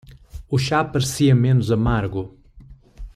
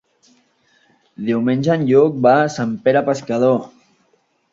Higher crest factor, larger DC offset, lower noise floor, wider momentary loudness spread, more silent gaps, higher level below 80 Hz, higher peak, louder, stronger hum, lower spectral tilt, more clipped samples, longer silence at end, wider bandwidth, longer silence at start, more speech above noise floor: about the same, 16 dB vs 16 dB; neither; second, -45 dBFS vs -62 dBFS; first, 11 LU vs 8 LU; neither; first, -38 dBFS vs -60 dBFS; second, -6 dBFS vs -2 dBFS; second, -20 LUFS vs -16 LUFS; neither; about the same, -6 dB/octave vs -7 dB/octave; neither; second, 0.05 s vs 0.85 s; first, 14 kHz vs 7.8 kHz; second, 0.1 s vs 1.2 s; second, 27 dB vs 46 dB